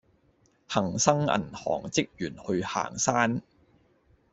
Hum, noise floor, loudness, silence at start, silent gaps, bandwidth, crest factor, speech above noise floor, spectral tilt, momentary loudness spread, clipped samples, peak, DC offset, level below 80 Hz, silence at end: none; -66 dBFS; -28 LUFS; 0.7 s; none; 8.2 kHz; 26 dB; 38 dB; -4 dB/octave; 8 LU; under 0.1%; -4 dBFS; under 0.1%; -60 dBFS; 0.9 s